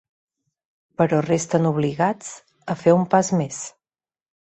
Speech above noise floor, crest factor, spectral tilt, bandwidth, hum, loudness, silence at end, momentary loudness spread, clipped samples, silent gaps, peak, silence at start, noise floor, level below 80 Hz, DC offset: over 70 dB; 20 dB; -6 dB/octave; 8.6 kHz; none; -21 LUFS; 0.9 s; 18 LU; under 0.1%; none; -4 dBFS; 1 s; under -90 dBFS; -62 dBFS; under 0.1%